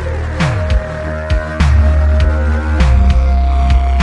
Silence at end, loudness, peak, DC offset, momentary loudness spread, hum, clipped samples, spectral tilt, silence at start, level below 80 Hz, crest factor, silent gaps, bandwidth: 0 s; -14 LUFS; 0 dBFS; under 0.1%; 7 LU; none; under 0.1%; -7 dB/octave; 0 s; -12 dBFS; 10 dB; none; 8.2 kHz